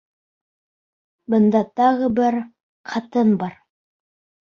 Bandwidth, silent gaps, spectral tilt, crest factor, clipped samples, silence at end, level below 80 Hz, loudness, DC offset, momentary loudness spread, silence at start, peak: 6.8 kHz; 2.63-2.84 s; -8 dB/octave; 16 dB; under 0.1%; 0.9 s; -62 dBFS; -19 LUFS; under 0.1%; 13 LU; 1.3 s; -4 dBFS